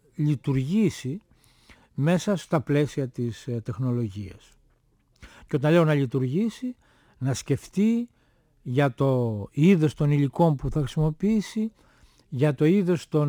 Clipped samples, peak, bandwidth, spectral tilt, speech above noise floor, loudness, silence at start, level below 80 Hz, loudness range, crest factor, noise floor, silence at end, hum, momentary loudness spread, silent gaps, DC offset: under 0.1%; -8 dBFS; 13 kHz; -7.5 dB/octave; 41 dB; -25 LUFS; 0.2 s; -50 dBFS; 4 LU; 16 dB; -64 dBFS; 0 s; none; 13 LU; none; under 0.1%